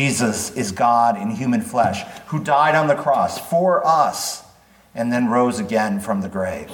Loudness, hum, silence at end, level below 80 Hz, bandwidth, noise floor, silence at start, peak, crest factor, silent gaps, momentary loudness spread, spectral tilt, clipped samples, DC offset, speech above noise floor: -19 LUFS; none; 0 s; -56 dBFS; 19 kHz; -51 dBFS; 0 s; -4 dBFS; 16 dB; none; 10 LU; -5 dB/octave; under 0.1%; under 0.1%; 32 dB